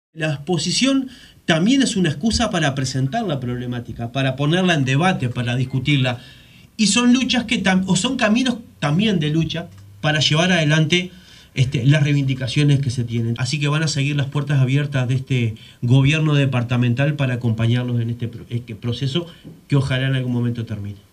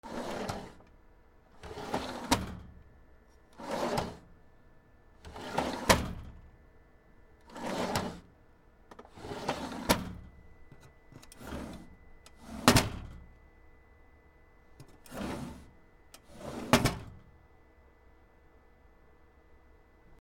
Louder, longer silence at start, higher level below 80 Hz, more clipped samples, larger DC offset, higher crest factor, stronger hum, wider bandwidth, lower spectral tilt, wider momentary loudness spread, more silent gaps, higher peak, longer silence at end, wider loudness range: first, -19 LUFS vs -33 LUFS; about the same, 0.15 s vs 0.05 s; about the same, -46 dBFS vs -50 dBFS; neither; neither; second, 16 dB vs 34 dB; neither; second, 10.5 kHz vs 19.5 kHz; first, -5.5 dB/octave vs -4 dB/octave; second, 11 LU vs 27 LU; neither; about the same, -2 dBFS vs -2 dBFS; about the same, 0.15 s vs 0.05 s; second, 3 LU vs 8 LU